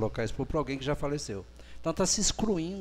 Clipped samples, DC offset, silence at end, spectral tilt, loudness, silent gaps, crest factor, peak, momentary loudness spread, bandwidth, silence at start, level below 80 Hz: under 0.1%; under 0.1%; 0 s; -4 dB/octave; -31 LUFS; none; 18 dB; -14 dBFS; 12 LU; 15.5 kHz; 0 s; -42 dBFS